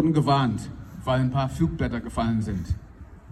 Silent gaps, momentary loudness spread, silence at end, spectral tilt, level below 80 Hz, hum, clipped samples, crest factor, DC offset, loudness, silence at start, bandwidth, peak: none; 12 LU; 0 s; -7.5 dB/octave; -40 dBFS; none; under 0.1%; 16 dB; under 0.1%; -26 LUFS; 0 s; 12.5 kHz; -8 dBFS